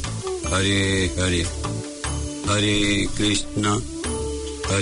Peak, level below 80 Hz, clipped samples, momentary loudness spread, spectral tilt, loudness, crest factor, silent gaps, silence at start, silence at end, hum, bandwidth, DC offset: -10 dBFS; -36 dBFS; under 0.1%; 9 LU; -4 dB/octave; -23 LUFS; 14 dB; none; 0 s; 0 s; none; 11 kHz; under 0.1%